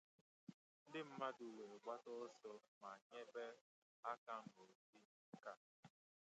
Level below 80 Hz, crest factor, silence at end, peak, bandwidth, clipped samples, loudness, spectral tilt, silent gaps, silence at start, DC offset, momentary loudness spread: under -90 dBFS; 22 dB; 0.45 s; -34 dBFS; 8.8 kHz; under 0.1%; -55 LUFS; -5 dB/octave; 0.54-0.86 s, 2.68-2.81 s, 3.02-3.10 s, 3.61-4.03 s, 4.18-4.27 s, 4.75-4.93 s, 5.05-5.32 s, 5.57-5.83 s; 0.5 s; under 0.1%; 16 LU